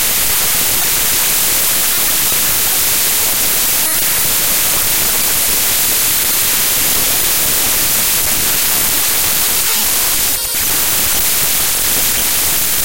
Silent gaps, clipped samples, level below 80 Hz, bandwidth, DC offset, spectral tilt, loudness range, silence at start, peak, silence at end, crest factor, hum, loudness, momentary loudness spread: none; under 0.1%; -36 dBFS; 16.5 kHz; 5%; 0 dB/octave; 1 LU; 0 s; 0 dBFS; 0 s; 12 dB; none; -10 LUFS; 1 LU